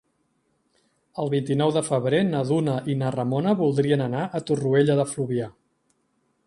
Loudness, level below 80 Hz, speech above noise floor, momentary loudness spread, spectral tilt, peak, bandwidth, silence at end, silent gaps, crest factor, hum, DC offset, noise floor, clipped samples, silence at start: -23 LUFS; -64 dBFS; 47 dB; 7 LU; -6.5 dB/octave; -6 dBFS; 11.5 kHz; 0.95 s; none; 18 dB; none; under 0.1%; -70 dBFS; under 0.1%; 1.15 s